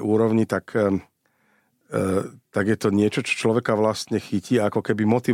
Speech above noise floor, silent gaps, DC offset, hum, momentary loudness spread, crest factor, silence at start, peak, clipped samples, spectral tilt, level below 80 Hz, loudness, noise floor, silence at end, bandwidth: 44 dB; none; under 0.1%; none; 6 LU; 14 dB; 0 s; -8 dBFS; under 0.1%; -6 dB/octave; -62 dBFS; -23 LUFS; -65 dBFS; 0 s; 15.5 kHz